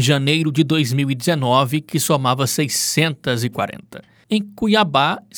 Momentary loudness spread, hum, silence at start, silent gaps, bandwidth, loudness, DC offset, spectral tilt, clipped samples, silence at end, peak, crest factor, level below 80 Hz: 7 LU; none; 0 s; none; over 20 kHz; -18 LUFS; under 0.1%; -4.5 dB/octave; under 0.1%; 0 s; 0 dBFS; 18 dB; -58 dBFS